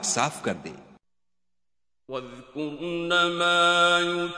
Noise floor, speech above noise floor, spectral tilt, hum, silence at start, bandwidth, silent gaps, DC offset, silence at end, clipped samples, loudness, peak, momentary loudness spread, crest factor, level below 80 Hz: -89 dBFS; 64 dB; -2.5 dB/octave; 60 Hz at -70 dBFS; 0 s; 11 kHz; none; under 0.1%; 0 s; under 0.1%; -23 LUFS; -6 dBFS; 18 LU; 20 dB; -62 dBFS